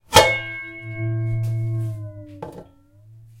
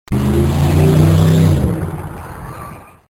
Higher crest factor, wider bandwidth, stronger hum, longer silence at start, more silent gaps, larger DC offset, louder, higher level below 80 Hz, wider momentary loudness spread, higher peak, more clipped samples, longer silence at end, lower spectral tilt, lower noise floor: first, 24 dB vs 14 dB; about the same, 16.5 kHz vs 16.5 kHz; neither; about the same, 0.1 s vs 0.1 s; neither; neither; second, -22 LUFS vs -13 LUFS; second, -46 dBFS vs -28 dBFS; first, 22 LU vs 19 LU; about the same, 0 dBFS vs 0 dBFS; neither; second, 0.15 s vs 0.35 s; second, -3.5 dB/octave vs -7.5 dB/octave; first, -50 dBFS vs -33 dBFS